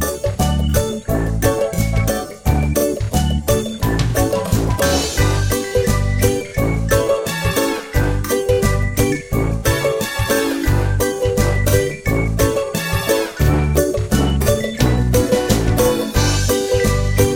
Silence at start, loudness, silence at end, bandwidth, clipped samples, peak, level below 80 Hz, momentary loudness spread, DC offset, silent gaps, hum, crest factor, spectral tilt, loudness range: 0 s; -17 LUFS; 0 s; 17 kHz; under 0.1%; 0 dBFS; -24 dBFS; 3 LU; under 0.1%; none; none; 16 dB; -5 dB/octave; 2 LU